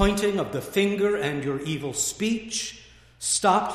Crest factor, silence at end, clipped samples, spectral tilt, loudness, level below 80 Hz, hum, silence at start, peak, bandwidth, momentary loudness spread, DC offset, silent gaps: 20 dB; 0 s; under 0.1%; -3.5 dB/octave; -25 LUFS; -42 dBFS; none; 0 s; -6 dBFS; 15.5 kHz; 8 LU; under 0.1%; none